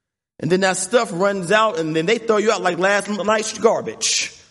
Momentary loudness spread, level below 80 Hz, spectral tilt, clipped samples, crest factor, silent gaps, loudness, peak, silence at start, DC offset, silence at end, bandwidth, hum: 4 LU; -64 dBFS; -3 dB/octave; under 0.1%; 16 dB; none; -18 LUFS; -2 dBFS; 0.4 s; under 0.1%; 0.15 s; 11.5 kHz; none